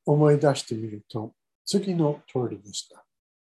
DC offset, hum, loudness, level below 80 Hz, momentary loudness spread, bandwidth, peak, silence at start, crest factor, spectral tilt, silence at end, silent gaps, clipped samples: under 0.1%; none; -26 LUFS; -70 dBFS; 16 LU; 12.5 kHz; -8 dBFS; 0.05 s; 18 dB; -6.5 dB/octave; 0.65 s; 1.55-1.65 s; under 0.1%